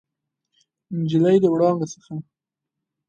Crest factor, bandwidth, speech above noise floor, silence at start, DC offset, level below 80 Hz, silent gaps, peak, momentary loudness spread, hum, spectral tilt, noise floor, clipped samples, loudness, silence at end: 16 dB; 8.8 kHz; 65 dB; 0.9 s; under 0.1%; -68 dBFS; none; -6 dBFS; 18 LU; none; -7.5 dB/octave; -85 dBFS; under 0.1%; -20 LUFS; 0.9 s